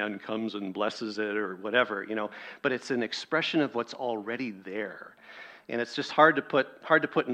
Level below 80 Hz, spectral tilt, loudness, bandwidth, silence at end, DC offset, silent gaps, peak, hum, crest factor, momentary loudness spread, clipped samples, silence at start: -78 dBFS; -5 dB/octave; -29 LUFS; 9.6 kHz; 0 s; under 0.1%; none; -6 dBFS; none; 24 dB; 13 LU; under 0.1%; 0 s